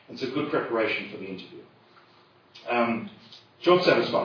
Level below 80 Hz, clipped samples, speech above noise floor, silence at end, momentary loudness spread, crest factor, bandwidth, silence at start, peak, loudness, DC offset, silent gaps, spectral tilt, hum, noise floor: -74 dBFS; under 0.1%; 32 dB; 0 s; 20 LU; 22 dB; 5.4 kHz; 0.1 s; -6 dBFS; -25 LUFS; under 0.1%; none; -6 dB/octave; none; -58 dBFS